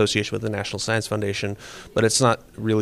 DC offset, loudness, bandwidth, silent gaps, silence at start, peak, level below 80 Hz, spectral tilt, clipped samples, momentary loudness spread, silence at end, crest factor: under 0.1%; -23 LUFS; 15 kHz; none; 0 s; -4 dBFS; -52 dBFS; -4 dB/octave; under 0.1%; 10 LU; 0 s; 18 dB